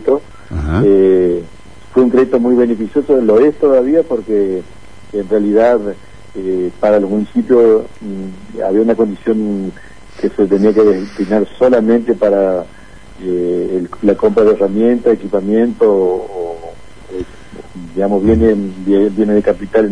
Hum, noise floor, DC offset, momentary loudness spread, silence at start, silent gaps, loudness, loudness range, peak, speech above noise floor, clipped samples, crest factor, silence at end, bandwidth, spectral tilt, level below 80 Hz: none; -38 dBFS; 2%; 15 LU; 0 s; none; -13 LUFS; 3 LU; 0 dBFS; 26 dB; under 0.1%; 14 dB; 0 s; 10 kHz; -8.5 dB/octave; -36 dBFS